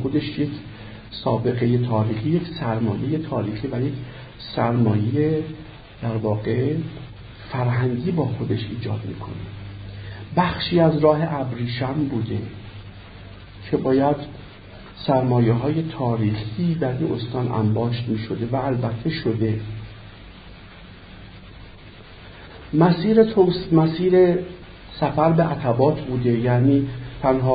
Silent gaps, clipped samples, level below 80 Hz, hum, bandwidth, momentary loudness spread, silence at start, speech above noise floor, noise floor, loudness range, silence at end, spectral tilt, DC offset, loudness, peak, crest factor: none; under 0.1%; -46 dBFS; none; 5 kHz; 23 LU; 0 s; 22 dB; -42 dBFS; 7 LU; 0 s; -12.5 dB/octave; under 0.1%; -22 LUFS; -2 dBFS; 18 dB